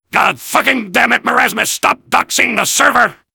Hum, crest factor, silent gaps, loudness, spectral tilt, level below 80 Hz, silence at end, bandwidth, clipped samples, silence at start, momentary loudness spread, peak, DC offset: none; 14 dB; none; -12 LUFS; -1.5 dB/octave; -54 dBFS; 0.2 s; over 20 kHz; 0.6%; 0.15 s; 3 LU; 0 dBFS; under 0.1%